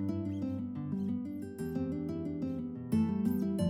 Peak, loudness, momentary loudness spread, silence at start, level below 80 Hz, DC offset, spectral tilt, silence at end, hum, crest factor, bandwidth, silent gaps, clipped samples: -20 dBFS; -36 LUFS; 7 LU; 0 s; -62 dBFS; under 0.1%; -8.5 dB/octave; 0 s; none; 14 dB; 16 kHz; none; under 0.1%